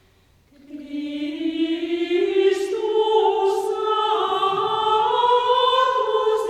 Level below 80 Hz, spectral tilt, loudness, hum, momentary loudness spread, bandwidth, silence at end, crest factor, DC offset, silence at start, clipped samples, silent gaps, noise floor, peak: -62 dBFS; -3.5 dB/octave; -20 LUFS; none; 9 LU; 13 kHz; 0 s; 14 dB; under 0.1%; 0.7 s; under 0.1%; none; -57 dBFS; -6 dBFS